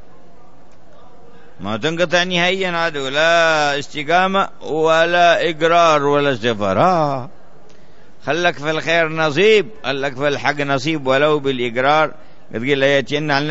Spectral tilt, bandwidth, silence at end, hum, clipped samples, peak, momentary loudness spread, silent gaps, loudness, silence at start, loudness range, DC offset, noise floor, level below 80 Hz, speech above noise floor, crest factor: -4.5 dB/octave; 8 kHz; 0 s; none; under 0.1%; -2 dBFS; 9 LU; none; -16 LUFS; 1.6 s; 4 LU; 3%; -48 dBFS; -56 dBFS; 32 dB; 16 dB